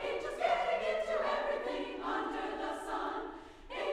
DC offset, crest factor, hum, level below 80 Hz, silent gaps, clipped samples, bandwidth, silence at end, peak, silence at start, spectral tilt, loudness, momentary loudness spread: under 0.1%; 16 dB; none; -58 dBFS; none; under 0.1%; 13.5 kHz; 0 s; -20 dBFS; 0 s; -3.5 dB/octave; -36 LUFS; 9 LU